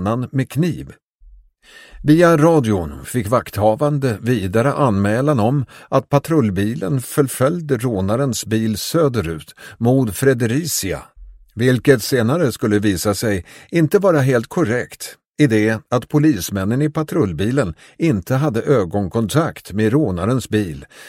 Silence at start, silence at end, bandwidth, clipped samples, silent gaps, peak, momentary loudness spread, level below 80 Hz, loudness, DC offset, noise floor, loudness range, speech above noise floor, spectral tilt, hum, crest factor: 0 s; 0 s; 16.5 kHz; under 0.1%; 1.03-1.19 s, 15.26-15.32 s; 0 dBFS; 8 LU; -44 dBFS; -18 LUFS; under 0.1%; -46 dBFS; 2 LU; 29 dB; -6 dB/octave; none; 18 dB